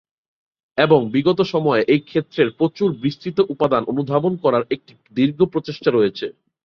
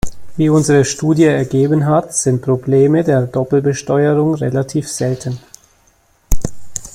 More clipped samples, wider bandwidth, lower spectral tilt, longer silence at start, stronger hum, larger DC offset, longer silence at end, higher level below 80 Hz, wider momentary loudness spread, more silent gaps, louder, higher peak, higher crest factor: neither; second, 6.6 kHz vs 16.5 kHz; first, -8 dB/octave vs -6 dB/octave; first, 0.75 s vs 0.05 s; neither; neither; first, 0.35 s vs 0.05 s; second, -58 dBFS vs -32 dBFS; about the same, 9 LU vs 11 LU; neither; second, -19 LUFS vs -15 LUFS; about the same, -2 dBFS vs 0 dBFS; about the same, 18 dB vs 14 dB